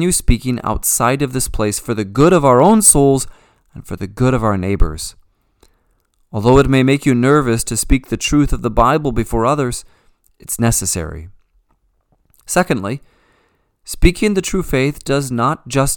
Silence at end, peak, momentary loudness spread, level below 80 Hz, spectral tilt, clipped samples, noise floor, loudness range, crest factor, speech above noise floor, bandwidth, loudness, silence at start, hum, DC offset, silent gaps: 0 s; 0 dBFS; 15 LU; -26 dBFS; -5 dB/octave; under 0.1%; -61 dBFS; 8 LU; 16 dB; 46 dB; 19.5 kHz; -15 LUFS; 0 s; none; under 0.1%; none